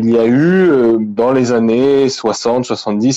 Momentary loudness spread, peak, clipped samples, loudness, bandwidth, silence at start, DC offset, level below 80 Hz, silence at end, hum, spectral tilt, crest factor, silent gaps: 6 LU; -4 dBFS; under 0.1%; -12 LUFS; 8 kHz; 0 s; under 0.1%; -52 dBFS; 0 s; none; -6 dB/octave; 8 dB; none